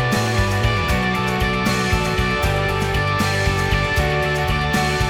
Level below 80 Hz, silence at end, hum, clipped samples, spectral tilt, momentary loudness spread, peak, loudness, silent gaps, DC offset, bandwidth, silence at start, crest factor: -28 dBFS; 0 s; none; under 0.1%; -5 dB/octave; 1 LU; -6 dBFS; -19 LUFS; none; under 0.1%; over 20 kHz; 0 s; 12 dB